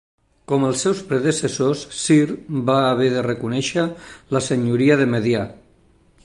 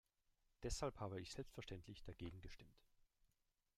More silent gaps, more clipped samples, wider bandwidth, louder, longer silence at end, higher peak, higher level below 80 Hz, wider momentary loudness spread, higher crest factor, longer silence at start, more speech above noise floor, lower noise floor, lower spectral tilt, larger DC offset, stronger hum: neither; neither; second, 11.5 kHz vs 15.5 kHz; first, -20 LUFS vs -52 LUFS; second, 0.7 s vs 1 s; first, -4 dBFS vs -32 dBFS; first, -54 dBFS vs -62 dBFS; second, 7 LU vs 13 LU; second, 16 dB vs 22 dB; about the same, 0.5 s vs 0.6 s; about the same, 36 dB vs 35 dB; second, -55 dBFS vs -87 dBFS; about the same, -5.5 dB/octave vs -4.5 dB/octave; neither; neither